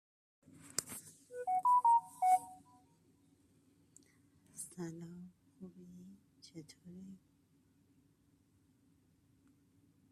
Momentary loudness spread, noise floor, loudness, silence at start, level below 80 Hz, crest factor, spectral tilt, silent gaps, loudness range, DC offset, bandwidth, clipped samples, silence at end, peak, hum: 26 LU; -72 dBFS; -34 LUFS; 0.75 s; -84 dBFS; 26 dB; -3.5 dB/octave; none; 23 LU; under 0.1%; 14 kHz; under 0.1%; 2.95 s; -16 dBFS; none